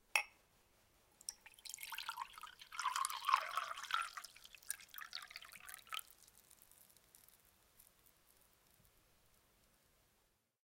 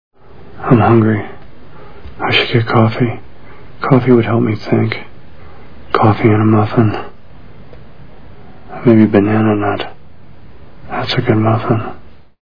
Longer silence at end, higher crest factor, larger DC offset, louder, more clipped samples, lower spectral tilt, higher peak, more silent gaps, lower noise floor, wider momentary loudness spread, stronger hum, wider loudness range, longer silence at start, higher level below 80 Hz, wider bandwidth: first, 2.9 s vs 0 s; first, 32 dB vs 14 dB; second, under 0.1% vs 4%; second, -44 LUFS vs -13 LUFS; second, under 0.1% vs 0.1%; second, 2 dB/octave vs -9 dB/octave; second, -16 dBFS vs 0 dBFS; neither; first, -80 dBFS vs -41 dBFS; first, 26 LU vs 15 LU; neither; first, 13 LU vs 2 LU; about the same, 0.15 s vs 0.1 s; second, -82 dBFS vs -44 dBFS; first, 17 kHz vs 5.4 kHz